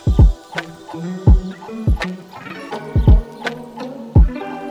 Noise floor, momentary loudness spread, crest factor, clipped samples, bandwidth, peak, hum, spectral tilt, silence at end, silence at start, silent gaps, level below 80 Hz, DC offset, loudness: -33 dBFS; 16 LU; 14 dB; under 0.1%; 8 kHz; -2 dBFS; none; -8 dB/octave; 0 s; 0.05 s; none; -18 dBFS; under 0.1%; -18 LUFS